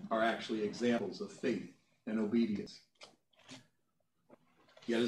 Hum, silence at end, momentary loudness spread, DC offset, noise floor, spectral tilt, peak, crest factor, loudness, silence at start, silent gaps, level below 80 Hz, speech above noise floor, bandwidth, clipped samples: none; 0 s; 22 LU; under 0.1%; -82 dBFS; -5.5 dB/octave; -20 dBFS; 18 dB; -36 LUFS; 0 s; none; -82 dBFS; 46 dB; 11 kHz; under 0.1%